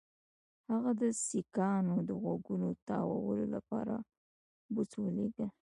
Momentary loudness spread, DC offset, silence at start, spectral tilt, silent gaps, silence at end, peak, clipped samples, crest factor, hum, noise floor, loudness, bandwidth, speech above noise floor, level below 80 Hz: 7 LU; under 0.1%; 0.7 s; -7 dB/octave; 2.82-2.86 s, 4.17-4.69 s; 0.25 s; -20 dBFS; under 0.1%; 16 dB; none; under -90 dBFS; -36 LUFS; 11 kHz; over 55 dB; -70 dBFS